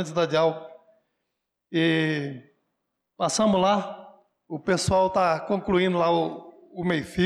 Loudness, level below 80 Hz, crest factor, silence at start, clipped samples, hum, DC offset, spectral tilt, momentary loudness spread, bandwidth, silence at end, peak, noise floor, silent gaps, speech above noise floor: -24 LUFS; -54 dBFS; 14 dB; 0 s; under 0.1%; none; under 0.1%; -5 dB/octave; 17 LU; 13 kHz; 0 s; -12 dBFS; -81 dBFS; none; 58 dB